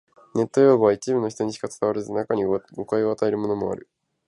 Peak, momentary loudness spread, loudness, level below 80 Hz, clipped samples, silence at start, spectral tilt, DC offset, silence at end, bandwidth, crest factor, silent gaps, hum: -4 dBFS; 11 LU; -23 LUFS; -60 dBFS; under 0.1%; 0.35 s; -6.5 dB/octave; under 0.1%; 0.5 s; 11.5 kHz; 18 dB; none; none